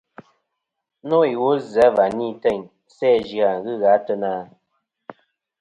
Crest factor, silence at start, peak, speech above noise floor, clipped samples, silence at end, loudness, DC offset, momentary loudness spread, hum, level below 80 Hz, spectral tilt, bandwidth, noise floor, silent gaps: 18 dB; 1.05 s; -2 dBFS; 61 dB; under 0.1%; 0.5 s; -20 LUFS; under 0.1%; 9 LU; none; -60 dBFS; -6.5 dB/octave; 9.4 kHz; -80 dBFS; none